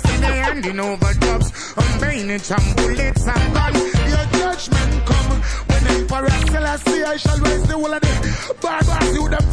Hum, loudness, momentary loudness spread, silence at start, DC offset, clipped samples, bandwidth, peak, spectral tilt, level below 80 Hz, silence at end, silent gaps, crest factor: none; -18 LUFS; 4 LU; 0 s; under 0.1%; under 0.1%; 11 kHz; -4 dBFS; -5 dB/octave; -20 dBFS; 0 s; none; 14 dB